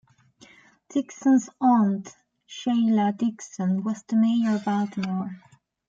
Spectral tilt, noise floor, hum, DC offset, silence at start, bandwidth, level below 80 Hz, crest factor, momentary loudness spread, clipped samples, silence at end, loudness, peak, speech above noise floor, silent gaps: -6.5 dB/octave; -55 dBFS; none; under 0.1%; 0.9 s; 7.6 kHz; -72 dBFS; 16 dB; 11 LU; under 0.1%; 0.5 s; -24 LUFS; -10 dBFS; 32 dB; none